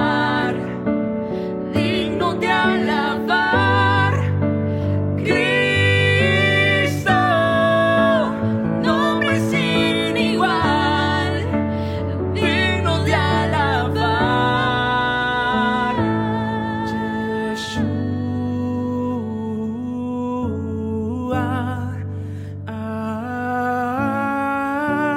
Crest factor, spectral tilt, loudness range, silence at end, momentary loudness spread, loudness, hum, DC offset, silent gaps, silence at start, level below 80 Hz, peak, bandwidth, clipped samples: 16 dB; -6 dB/octave; 8 LU; 0 s; 9 LU; -19 LUFS; none; under 0.1%; none; 0 s; -48 dBFS; -4 dBFS; 13 kHz; under 0.1%